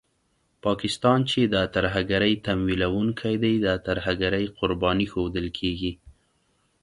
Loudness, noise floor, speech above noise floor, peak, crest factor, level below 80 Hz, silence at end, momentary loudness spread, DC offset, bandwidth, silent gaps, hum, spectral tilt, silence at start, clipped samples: -24 LUFS; -70 dBFS; 45 dB; -6 dBFS; 20 dB; -44 dBFS; 0.7 s; 6 LU; under 0.1%; 11.5 kHz; none; none; -6 dB/octave; 0.65 s; under 0.1%